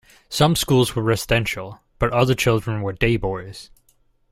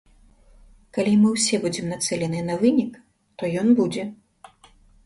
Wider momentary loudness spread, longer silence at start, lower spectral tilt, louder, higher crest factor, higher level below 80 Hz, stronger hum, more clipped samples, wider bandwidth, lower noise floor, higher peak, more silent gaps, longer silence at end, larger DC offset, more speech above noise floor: about the same, 13 LU vs 13 LU; second, 0.3 s vs 0.95 s; about the same, -5 dB/octave vs -5 dB/octave; about the same, -20 LUFS vs -22 LUFS; about the same, 18 dB vs 16 dB; first, -38 dBFS vs -56 dBFS; neither; neither; first, 16 kHz vs 11.5 kHz; first, -61 dBFS vs -54 dBFS; first, -2 dBFS vs -8 dBFS; neither; second, 0.65 s vs 0.9 s; neither; first, 41 dB vs 33 dB